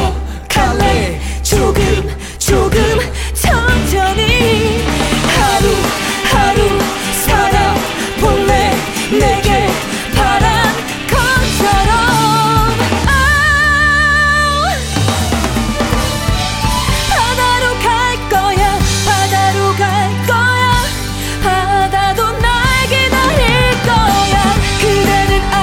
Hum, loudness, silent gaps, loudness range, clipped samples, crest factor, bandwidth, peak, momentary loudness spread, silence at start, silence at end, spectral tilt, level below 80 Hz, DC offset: none; -12 LUFS; none; 3 LU; under 0.1%; 12 dB; 17 kHz; 0 dBFS; 5 LU; 0 s; 0 s; -4 dB/octave; -20 dBFS; under 0.1%